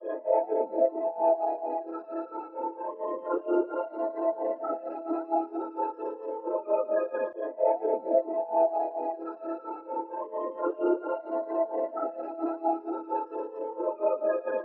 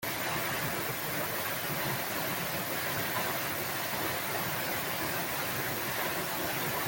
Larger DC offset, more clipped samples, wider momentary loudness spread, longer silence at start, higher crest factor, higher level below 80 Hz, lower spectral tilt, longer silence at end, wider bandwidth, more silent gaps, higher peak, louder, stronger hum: neither; neither; first, 9 LU vs 1 LU; about the same, 0 s vs 0 s; about the same, 18 dB vs 14 dB; second, under -90 dBFS vs -62 dBFS; first, -4.5 dB/octave vs -3 dB/octave; about the same, 0 s vs 0 s; second, 3 kHz vs 17 kHz; neither; first, -12 dBFS vs -20 dBFS; about the same, -30 LUFS vs -32 LUFS; neither